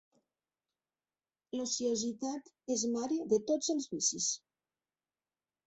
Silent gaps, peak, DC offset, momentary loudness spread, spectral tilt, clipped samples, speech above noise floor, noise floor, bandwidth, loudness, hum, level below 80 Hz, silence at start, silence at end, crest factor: none; -18 dBFS; under 0.1%; 9 LU; -3 dB/octave; under 0.1%; over 56 dB; under -90 dBFS; 8.2 kHz; -34 LUFS; none; -78 dBFS; 1.55 s; 1.3 s; 18 dB